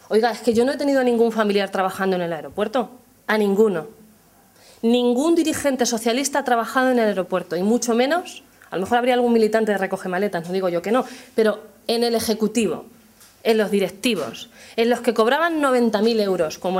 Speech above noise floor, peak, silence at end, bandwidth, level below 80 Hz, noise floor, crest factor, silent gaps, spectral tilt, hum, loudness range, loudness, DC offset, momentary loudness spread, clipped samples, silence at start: 33 dB; -4 dBFS; 0 s; 16 kHz; -60 dBFS; -53 dBFS; 16 dB; none; -4.5 dB/octave; none; 3 LU; -20 LUFS; under 0.1%; 8 LU; under 0.1%; 0.1 s